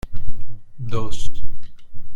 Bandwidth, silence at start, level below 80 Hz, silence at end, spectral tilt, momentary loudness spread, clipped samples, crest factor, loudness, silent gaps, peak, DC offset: 8 kHz; 0.05 s; -30 dBFS; 0 s; -6 dB/octave; 18 LU; under 0.1%; 10 dB; -33 LUFS; none; -2 dBFS; under 0.1%